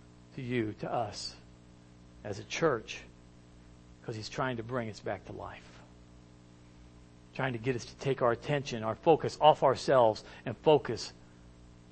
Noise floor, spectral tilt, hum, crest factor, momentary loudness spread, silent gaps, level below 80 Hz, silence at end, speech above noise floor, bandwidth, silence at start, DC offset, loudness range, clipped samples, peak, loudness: -56 dBFS; -5.5 dB/octave; 60 Hz at -60 dBFS; 24 dB; 18 LU; none; -60 dBFS; 0.25 s; 25 dB; 8.8 kHz; 0.35 s; under 0.1%; 12 LU; under 0.1%; -8 dBFS; -31 LUFS